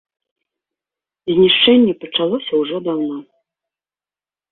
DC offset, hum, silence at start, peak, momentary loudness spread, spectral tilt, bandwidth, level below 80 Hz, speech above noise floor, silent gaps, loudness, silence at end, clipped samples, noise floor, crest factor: under 0.1%; 50 Hz at -50 dBFS; 1.25 s; -2 dBFS; 14 LU; -9 dB/octave; 4.3 kHz; -58 dBFS; over 75 dB; none; -15 LUFS; 1.3 s; under 0.1%; under -90 dBFS; 16 dB